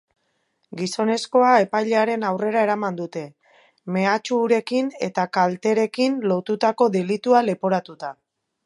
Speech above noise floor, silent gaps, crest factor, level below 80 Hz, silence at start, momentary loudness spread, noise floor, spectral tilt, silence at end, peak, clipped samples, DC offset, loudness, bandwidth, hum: 50 dB; none; 18 dB; -76 dBFS; 0.7 s; 13 LU; -70 dBFS; -5.5 dB/octave; 0.55 s; -2 dBFS; under 0.1%; under 0.1%; -21 LUFS; 11.5 kHz; none